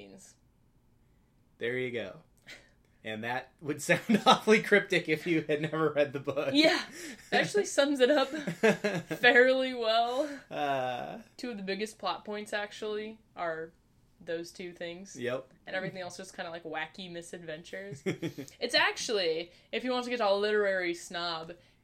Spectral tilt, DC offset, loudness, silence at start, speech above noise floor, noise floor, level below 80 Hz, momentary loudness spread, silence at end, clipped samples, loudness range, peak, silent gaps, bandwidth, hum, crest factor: -4 dB/octave; under 0.1%; -30 LUFS; 0 s; 35 dB; -66 dBFS; -70 dBFS; 17 LU; 0.3 s; under 0.1%; 12 LU; -8 dBFS; none; 16 kHz; none; 24 dB